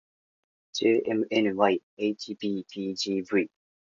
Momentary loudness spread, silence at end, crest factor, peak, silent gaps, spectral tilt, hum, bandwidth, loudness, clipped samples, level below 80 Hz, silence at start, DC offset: 9 LU; 0.45 s; 20 dB; -8 dBFS; 1.83-1.97 s; -5 dB/octave; none; 7.6 kHz; -28 LUFS; under 0.1%; -72 dBFS; 0.75 s; under 0.1%